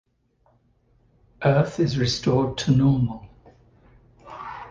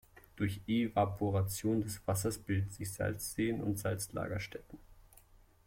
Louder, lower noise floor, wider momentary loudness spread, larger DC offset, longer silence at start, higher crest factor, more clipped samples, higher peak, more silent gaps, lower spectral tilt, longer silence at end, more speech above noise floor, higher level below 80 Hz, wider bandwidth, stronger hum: first, -22 LUFS vs -36 LUFS; about the same, -64 dBFS vs -62 dBFS; first, 19 LU vs 6 LU; neither; first, 1.4 s vs 0.15 s; about the same, 20 dB vs 18 dB; neither; first, -6 dBFS vs -18 dBFS; neither; about the same, -6.5 dB/octave vs -5.5 dB/octave; second, 0 s vs 0.65 s; first, 44 dB vs 27 dB; first, -48 dBFS vs -58 dBFS; second, 7.6 kHz vs 16.5 kHz; neither